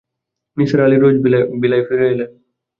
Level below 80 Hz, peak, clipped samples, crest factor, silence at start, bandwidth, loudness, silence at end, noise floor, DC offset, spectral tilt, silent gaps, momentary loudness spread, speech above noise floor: -54 dBFS; -2 dBFS; under 0.1%; 14 dB; 0.55 s; 6.8 kHz; -14 LUFS; 0.5 s; -79 dBFS; under 0.1%; -9 dB/octave; none; 11 LU; 66 dB